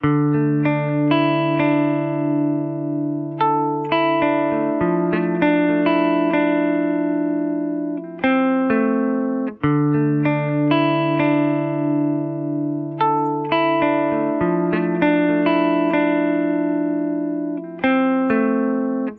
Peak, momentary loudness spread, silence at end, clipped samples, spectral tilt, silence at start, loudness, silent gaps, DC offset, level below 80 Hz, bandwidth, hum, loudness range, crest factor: -4 dBFS; 6 LU; 0 s; under 0.1%; -10.5 dB/octave; 0 s; -19 LUFS; none; under 0.1%; -58 dBFS; 4.6 kHz; none; 2 LU; 14 dB